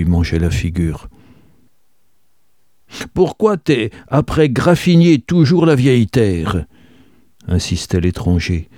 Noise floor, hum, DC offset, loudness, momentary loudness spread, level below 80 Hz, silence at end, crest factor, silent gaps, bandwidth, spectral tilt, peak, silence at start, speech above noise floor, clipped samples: -65 dBFS; none; 0.3%; -15 LUFS; 11 LU; -32 dBFS; 0.15 s; 14 dB; none; 13.5 kHz; -7 dB/octave; 0 dBFS; 0 s; 51 dB; under 0.1%